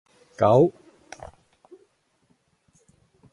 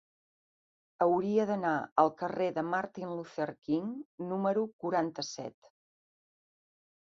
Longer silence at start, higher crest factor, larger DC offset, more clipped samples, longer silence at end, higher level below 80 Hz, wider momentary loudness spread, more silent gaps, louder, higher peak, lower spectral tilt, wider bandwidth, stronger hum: second, 0.4 s vs 1 s; about the same, 22 dB vs 22 dB; neither; neither; first, 2.65 s vs 1.7 s; first, -60 dBFS vs -78 dBFS; first, 28 LU vs 11 LU; second, none vs 1.92-1.96 s, 4.05-4.18 s, 4.73-4.79 s; first, -20 LUFS vs -32 LUFS; first, -6 dBFS vs -12 dBFS; first, -8.5 dB/octave vs -6 dB/octave; first, 11.5 kHz vs 7.6 kHz; neither